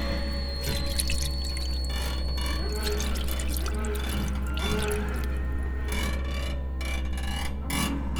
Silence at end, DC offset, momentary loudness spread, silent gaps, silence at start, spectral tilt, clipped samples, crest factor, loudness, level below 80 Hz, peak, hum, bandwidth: 0 s; under 0.1%; 4 LU; none; 0 s; -4.5 dB/octave; under 0.1%; 20 dB; -30 LUFS; -30 dBFS; -8 dBFS; none; 20 kHz